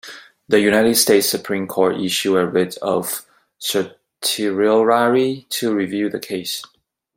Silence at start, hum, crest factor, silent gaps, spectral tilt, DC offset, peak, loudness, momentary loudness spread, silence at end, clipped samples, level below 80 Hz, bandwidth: 0.05 s; none; 18 dB; none; -3.5 dB/octave; under 0.1%; 0 dBFS; -18 LUFS; 12 LU; 0.5 s; under 0.1%; -62 dBFS; 16.5 kHz